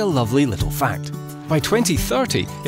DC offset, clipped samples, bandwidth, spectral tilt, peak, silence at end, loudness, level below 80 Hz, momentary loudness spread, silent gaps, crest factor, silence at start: under 0.1%; under 0.1%; 16.5 kHz; -5 dB/octave; -6 dBFS; 0 s; -20 LUFS; -36 dBFS; 9 LU; none; 14 dB; 0 s